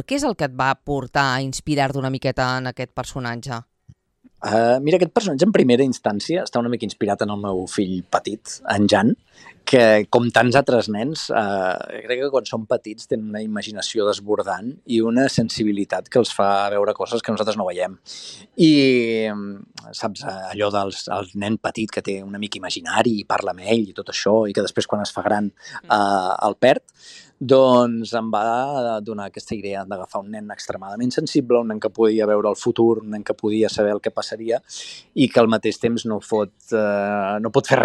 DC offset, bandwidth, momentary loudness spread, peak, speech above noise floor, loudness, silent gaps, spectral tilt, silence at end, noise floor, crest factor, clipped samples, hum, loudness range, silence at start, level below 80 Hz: under 0.1%; 12.5 kHz; 13 LU; -2 dBFS; 34 dB; -20 LUFS; none; -5 dB/octave; 0 s; -55 dBFS; 18 dB; under 0.1%; none; 6 LU; 0 s; -56 dBFS